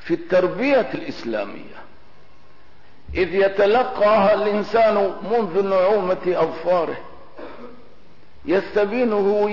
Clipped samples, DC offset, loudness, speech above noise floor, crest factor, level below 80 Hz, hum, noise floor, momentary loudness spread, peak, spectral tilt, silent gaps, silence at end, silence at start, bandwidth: under 0.1%; 2%; -20 LUFS; 33 dB; 12 dB; -50 dBFS; 50 Hz at -60 dBFS; -53 dBFS; 15 LU; -8 dBFS; -7 dB/octave; none; 0 s; 0.05 s; 6 kHz